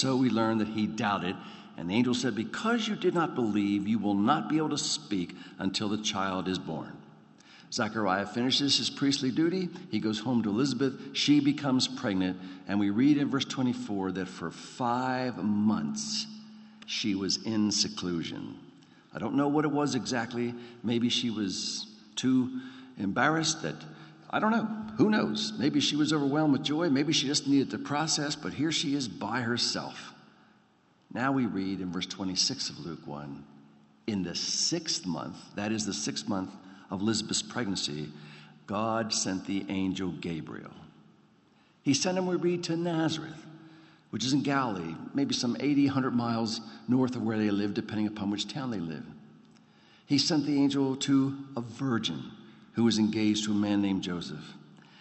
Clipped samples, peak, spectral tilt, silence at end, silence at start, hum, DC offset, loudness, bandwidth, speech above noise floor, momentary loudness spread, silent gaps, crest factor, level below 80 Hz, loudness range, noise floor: under 0.1%; -10 dBFS; -4 dB/octave; 0.25 s; 0 s; none; under 0.1%; -29 LUFS; 8.4 kHz; 36 dB; 14 LU; none; 20 dB; -72 dBFS; 5 LU; -65 dBFS